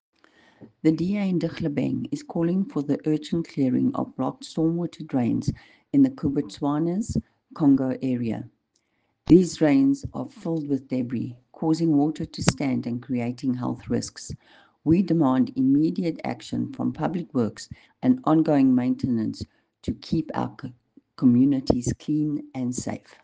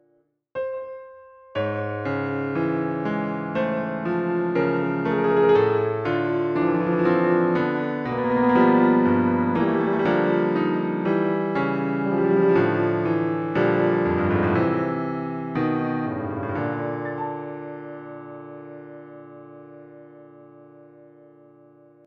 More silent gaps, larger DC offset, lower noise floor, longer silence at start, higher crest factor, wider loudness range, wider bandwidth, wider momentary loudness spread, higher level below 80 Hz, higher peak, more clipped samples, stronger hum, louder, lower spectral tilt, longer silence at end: neither; neither; first, -72 dBFS vs -66 dBFS; about the same, 0.6 s vs 0.55 s; first, 22 dB vs 16 dB; second, 3 LU vs 12 LU; first, 9.4 kHz vs 5.8 kHz; second, 12 LU vs 18 LU; about the same, -52 dBFS vs -56 dBFS; first, -2 dBFS vs -6 dBFS; neither; neither; about the same, -24 LUFS vs -22 LUFS; second, -7 dB/octave vs -9.5 dB/octave; second, 0.25 s vs 1.45 s